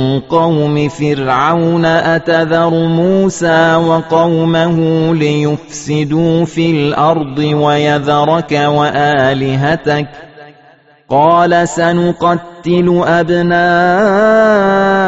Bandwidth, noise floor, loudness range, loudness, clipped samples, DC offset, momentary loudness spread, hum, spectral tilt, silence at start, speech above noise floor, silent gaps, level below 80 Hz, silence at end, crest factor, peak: 8 kHz; -45 dBFS; 2 LU; -11 LUFS; under 0.1%; under 0.1%; 5 LU; none; -5 dB/octave; 0 s; 34 dB; none; -44 dBFS; 0 s; 12 dB; 0 dBFS